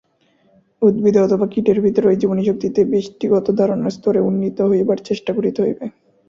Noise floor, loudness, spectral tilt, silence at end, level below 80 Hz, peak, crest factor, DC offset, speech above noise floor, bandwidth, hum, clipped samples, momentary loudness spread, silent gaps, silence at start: -59 dBFS; -17 LUFS; -8 dB/octave; 0.4 s; -56 dBFS; -2 dBFS; 16 dB; under 0.1%; 42 dB; 7.4 kHz; none; under 0.1%; 6 LU; none; 0.8 s